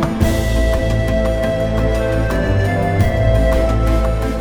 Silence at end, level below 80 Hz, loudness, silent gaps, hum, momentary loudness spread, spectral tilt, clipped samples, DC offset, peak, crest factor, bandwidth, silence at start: 0 s; -18 dBFS; -17 LUFS; none; none; 3 LU; -7 dB/octave; under 0.1%; under 0.1%; -2 dBFS; 14 dB; 17 kHz; 0 s